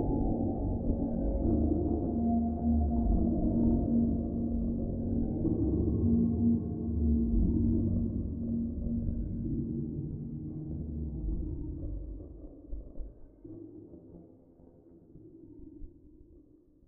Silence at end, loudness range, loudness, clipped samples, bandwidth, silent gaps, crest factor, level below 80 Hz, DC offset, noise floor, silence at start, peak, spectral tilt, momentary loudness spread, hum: 0.5 s; 20 LU; -32 LUFS; under 0.1%; 1.5 kHz; none; 16 dB; -38 dBFS; under 0.1%; -60 dBFS; 0 s; -16 dBFS; -14.5 dB/octave; 20 LU; none